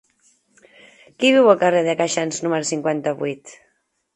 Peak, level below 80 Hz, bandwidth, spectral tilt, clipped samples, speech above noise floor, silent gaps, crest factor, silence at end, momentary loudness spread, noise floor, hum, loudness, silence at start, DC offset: 0 dBFS; -70 dBFS; 11 kHz; -4 dB/octave; under 0.1%; 49 dB; none; 20 dB; 0.6 s; 12 LU; -68 dBFS; none; -19 LUFS; 1.2 s; under 0.1%